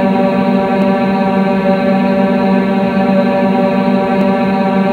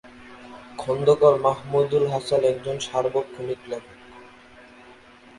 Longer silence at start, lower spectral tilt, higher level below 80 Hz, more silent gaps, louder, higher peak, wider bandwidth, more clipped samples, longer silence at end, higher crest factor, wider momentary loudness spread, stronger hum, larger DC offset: about the same, 0 s vs 0.05 s; first, -8.5 dB/octave vs -5.5 dB/octave; first, -46 dBFS vs -60 dBFS; neither; first, -12 LUFS vs -22 LUFS; first, 0 dBFS vs -4 dBFS; second, 4.7 kHz vs 11.5 kHz; neither; second, 0 s vs 1.15 s; second, 12 dB vs 20 dB; second, 1 LU vs 20 LU; neither; neither